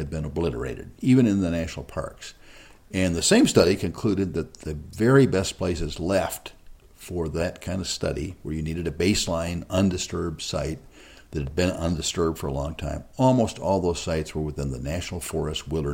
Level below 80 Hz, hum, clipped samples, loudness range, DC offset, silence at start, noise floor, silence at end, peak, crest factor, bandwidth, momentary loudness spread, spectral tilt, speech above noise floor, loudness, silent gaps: -42 dBFS; none; under 0.1%; 6 LU; under 0.1%; 0 s; -48 dBFS; 0 s; -4 dBFS; 20 dB; 16.5 kHz; 14 LU; -5 dB/octave; 24 dB; -25 LUFS; none